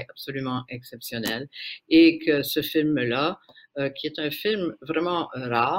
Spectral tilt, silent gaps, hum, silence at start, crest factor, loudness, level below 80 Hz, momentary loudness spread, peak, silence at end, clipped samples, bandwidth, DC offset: -5.5 dB/octave; none; none; 0 s; 18 dB; -24 LUFS; -64 dBFS; 17 LU; -6 dBFS; 0 s; under 0.1%; 16 kHz; under 0.1%